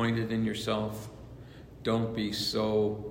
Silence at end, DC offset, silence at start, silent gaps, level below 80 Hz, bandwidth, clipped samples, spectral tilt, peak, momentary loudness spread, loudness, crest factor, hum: 0 s; under 0.1%; 0 s; none; -54 dBFS; 16 kHz; under 0.1%; -5.5 dB/octave; -16 dBFS; 20 LU; -31 LUFS; 14 dB; none